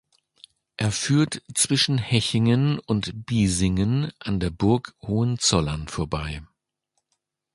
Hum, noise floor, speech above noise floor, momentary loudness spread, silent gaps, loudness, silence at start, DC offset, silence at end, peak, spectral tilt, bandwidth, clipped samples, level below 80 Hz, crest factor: none; -77 dBFS; 54 dB; 8 LU; none; -23 LUFS; 0.8 s; under 0.1%; 1.1 s; -4 dBFS; -4.5 dB/octave; 11.5 kHz; under 0.1%; -42 dBFS; 20 dB